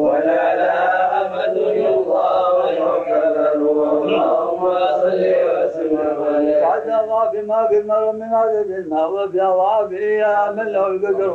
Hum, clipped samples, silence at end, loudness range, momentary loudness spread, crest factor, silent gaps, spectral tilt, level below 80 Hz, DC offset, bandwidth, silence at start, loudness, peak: none; under 0.1%; 0 s; 1 LU; 3 LU; 8 dB; none; -7 dB/octave; -62 dBFS; under 0.1%; 7.2 kHz; 0 s; -17 LUFS; -8 dBFS